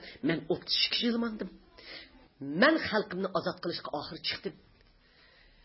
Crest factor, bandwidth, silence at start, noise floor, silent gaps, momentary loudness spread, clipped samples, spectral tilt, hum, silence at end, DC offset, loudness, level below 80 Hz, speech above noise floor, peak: 22 dB; 5.8 kHz; 0 s; -62 dBFS; none; 20 LU; under 0.1%; -7.5 dB/octave; none; 1.1 s; under 0.1%; -30 LUFS; -64 dBFS; 31 dB; -10 dBFS